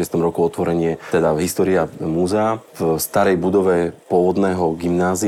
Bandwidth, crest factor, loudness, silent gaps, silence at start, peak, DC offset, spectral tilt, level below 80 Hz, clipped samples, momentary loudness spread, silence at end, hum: 16.5 kHz; 14 dB; -18 LUFS; none; 0 s; -4 dBFS; under 0.1%; -6 dB/octave; -48 dBFS; under 0.1%; 5 LU; 0 s; none